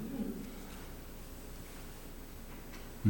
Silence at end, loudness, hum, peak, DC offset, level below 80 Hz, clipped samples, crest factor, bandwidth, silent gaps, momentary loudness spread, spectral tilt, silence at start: 0 s; -47 LUFS; none; -18 dBFS; under 0.1%; -50 dBFS; under 0.1%; 22 dB; 19 kHz; none; 8 LU; -6 dB/octave; 0 s